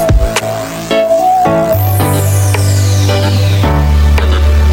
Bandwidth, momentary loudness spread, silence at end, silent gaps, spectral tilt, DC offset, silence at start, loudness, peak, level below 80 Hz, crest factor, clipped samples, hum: 17 kHz; 4 LU; 0 s; none; -5.5 dB/octave; under 0.1%; 0 s; -11 LUFS; 0 dBFS; -14 dBFS; 8 dB; under 0.1%; none